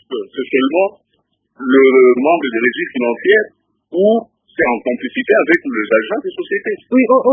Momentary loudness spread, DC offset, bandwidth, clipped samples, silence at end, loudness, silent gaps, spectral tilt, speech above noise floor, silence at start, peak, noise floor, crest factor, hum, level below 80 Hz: 11 LU; under 0.1%; 3.7 kHz; under 0.1%; 0 s; -14 LUFS; none; -7.5 dB/octave; 52 dB; 0.1 s; 0 dBFS; -65 dBFS; 14 dB; none; -62 dBFS